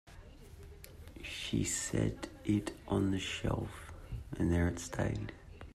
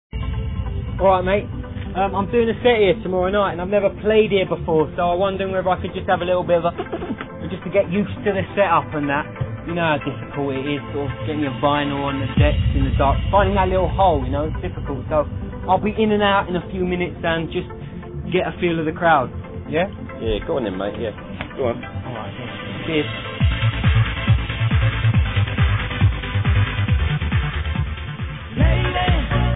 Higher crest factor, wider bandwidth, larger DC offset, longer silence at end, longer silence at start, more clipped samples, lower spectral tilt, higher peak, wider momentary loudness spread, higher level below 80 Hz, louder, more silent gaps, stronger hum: about the same, 18 dB vs 16 dB; first, 14.5 kHz vs 4 kHz; second, under 0.1% vs 0.2%; about the same, 0.05 s vs 0 s; about the same, 0.05 s vs 0.15 s; neither; second, -5 dB/octave vs -10.5 dB/octave; second, -20 dBFS vs -4 dBFS; first, 19 LU vs 11 LU; second, -50 dBFS vs -28 dBFS; second, -36 LUFS vs -21 LUFS; neither; neither